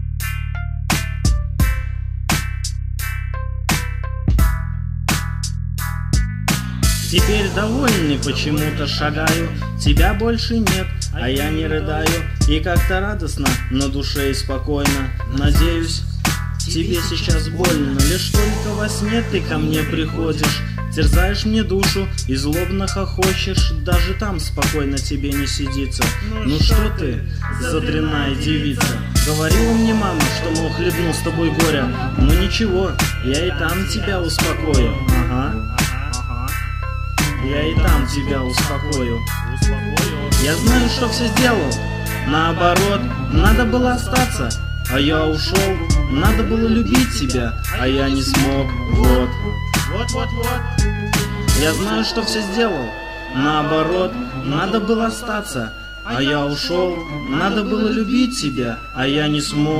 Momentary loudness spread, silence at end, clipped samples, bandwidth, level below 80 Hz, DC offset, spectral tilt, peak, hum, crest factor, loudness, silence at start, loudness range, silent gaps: 7 LU; 0 s; under 0.1%; 16 kHz; -22 dBFS; under 0.1%; -5 dB/octave; 0 dBFS; none; 18 dB; -19 LUFS; 0 s; 3 LU; none